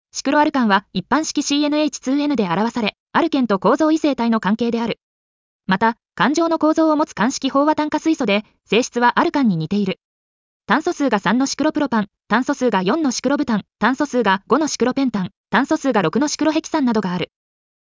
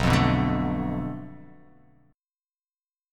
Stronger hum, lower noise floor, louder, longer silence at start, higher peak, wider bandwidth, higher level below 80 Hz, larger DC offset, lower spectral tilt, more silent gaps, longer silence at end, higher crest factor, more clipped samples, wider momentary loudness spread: neither; about the same, under -90 dBFS vs under -90 dBFS; first, -18 LUFS vs -25 LUFS; first, 0.15 s vs 0 s; about the same, -4 dBFS vs -6 dBFS; second, 7.6 kHz vs 15 kHz; second, -58 dBFS vs -40 dBFS; neither; second, -4.5 dB/octave vs -6.5 dB/octave; first, 3.00-3.06 s, 5.03-5.60 s, 10.04-10.60 s, 15.37-15.44 s vs none; second, 0.6 s vs 1.65 s; second, 14 dB vs 22 dB; neither; second, 5 LU vs 17 LU